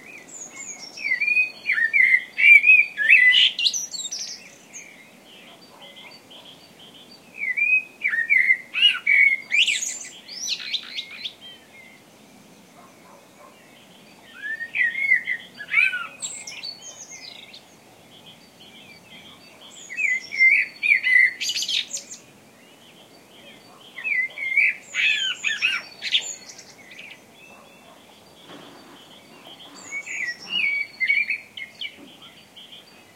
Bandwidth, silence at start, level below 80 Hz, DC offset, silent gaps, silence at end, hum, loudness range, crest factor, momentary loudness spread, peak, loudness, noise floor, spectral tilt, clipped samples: 16 kHz; 0.05 s; -78 dBFS; under 0.1%; none; 0.35 s; none; 20 LU; 22 dB; 23 LU; -2 dBFS; -18 LUFS; -50 dBFS; 2 dB/octave; under 0.1%